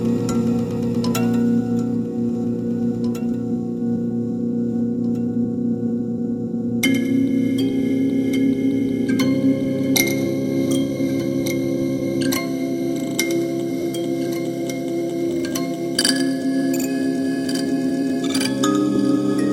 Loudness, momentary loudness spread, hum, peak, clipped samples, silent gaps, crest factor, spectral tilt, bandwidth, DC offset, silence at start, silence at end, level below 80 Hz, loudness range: -21 LUFS; 5 LU; none; 0 dBFS; under 0.1%; none; 20 dB; -5 dB/octave; 17 kHz; under 0.1%; 0 s; 0 s; -54 dBFS; 3 LU